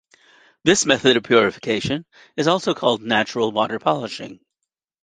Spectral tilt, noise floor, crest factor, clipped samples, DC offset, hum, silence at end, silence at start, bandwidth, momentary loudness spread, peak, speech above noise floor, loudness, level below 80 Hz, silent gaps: -3.5 dB/octave; -82 dBFS; 20 dB; under 0.1%; under 0.1%; none; 0.7 s; 0.65 s; 9.6 kHz; 13 LU; -2 dBFS; 62 dB; -19 LUFS; -58 dBFS; none